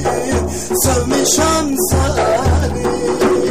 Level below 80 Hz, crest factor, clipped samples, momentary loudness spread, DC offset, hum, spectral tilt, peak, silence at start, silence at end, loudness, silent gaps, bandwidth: -26 dBFS; 12 dB; under 0.1%; 5 LU; 2%; none; -4.5 dB/octave; -2 dBFS; 0 s; 0 s; -15 LUFS; none; 15.5 kHz